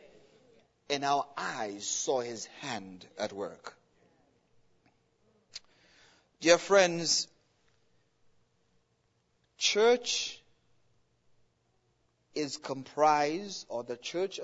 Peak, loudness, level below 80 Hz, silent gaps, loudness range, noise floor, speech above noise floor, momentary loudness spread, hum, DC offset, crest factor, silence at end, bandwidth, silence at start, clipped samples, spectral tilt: -8 dBFS; -30 LUFS; -78 dBFS; none; 13 LU; -74 dBFS; 44 dB; 18 LU; none; under 0.1%; 26 dB; 0 s; 8 kHz; 0.9 s; under 0.1%; -2 dB/octave